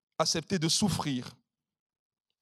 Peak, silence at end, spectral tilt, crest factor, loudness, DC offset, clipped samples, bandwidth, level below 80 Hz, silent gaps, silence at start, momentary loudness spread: -14 dBFS; 1.1 s; -3.5 dB/octave; 20 dB; -29 LUFS; under 0.1%; under 0.1%; 15 kHz; -62 dBFS; none; 0.2 s; 10 LU